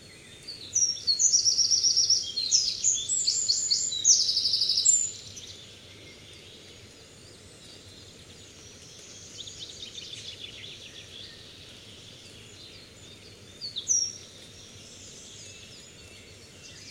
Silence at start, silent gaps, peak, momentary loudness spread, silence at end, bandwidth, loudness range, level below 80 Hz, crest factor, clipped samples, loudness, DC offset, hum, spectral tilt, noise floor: 0 s; none; -8 dBFS; 26 LU; 0 s; 16 kHz; 23 LU; -64 dBFS; 22 dB; under 0.1%; -22 LUFS; under 0.1%; none; 1.5 dB/octave; -50 dBFS